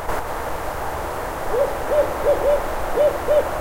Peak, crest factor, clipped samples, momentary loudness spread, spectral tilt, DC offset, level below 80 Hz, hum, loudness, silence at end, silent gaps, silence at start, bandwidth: -8 dBFS; 14 dB; under 0.1%; 8 LU; -5 dB/octave; under 0.1%; -34 dBFS; none; -22 LUFS; 0 s; none; 0 s; 16 kHz